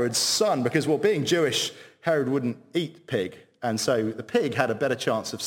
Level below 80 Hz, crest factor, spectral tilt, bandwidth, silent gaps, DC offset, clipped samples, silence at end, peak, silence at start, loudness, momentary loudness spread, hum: -70 dBFS; 20 dB; -4 dB/octave; 17 kHz; none; under 0.1%; under 0.1%; 0 s; -4 dBFS; 0 s; -25 LUFS; 8 LU; none